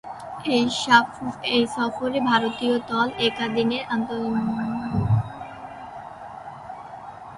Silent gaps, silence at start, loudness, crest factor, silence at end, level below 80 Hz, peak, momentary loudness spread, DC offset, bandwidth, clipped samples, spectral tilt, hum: none; 0.05 s; -23 LUFS; 22 dB; 0 s; -50 dBFS; -2 dBFS; 19 LU; under 0.1%; 11.5 kHz; under 0.1%; -5.5 dB/octave; none